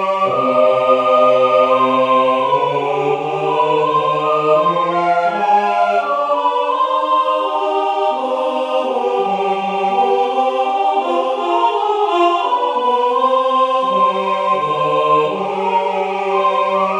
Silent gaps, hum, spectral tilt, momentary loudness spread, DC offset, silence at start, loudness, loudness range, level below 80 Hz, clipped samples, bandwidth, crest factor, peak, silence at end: none; none; -5.5 dB/octave; 5 LU; under 0.1%; 0 s; -15 LUFS; 3 LU; -64 dBFS; under 0.1%; 10 kHz; 14 dB; 0 dBFS; 0 s